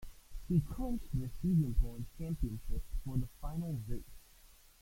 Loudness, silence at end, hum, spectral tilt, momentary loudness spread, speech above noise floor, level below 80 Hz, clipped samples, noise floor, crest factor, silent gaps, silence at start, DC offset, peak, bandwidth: -38 LUFS; 0.35 s; none; -8.5 dB/octave; 14 LU; 26 dB; -40 dBFS; under 0.1%; -61 dBFS; 18 dB; none; 0 s; under 0.1%; -18 dBFS; 16.5 kHz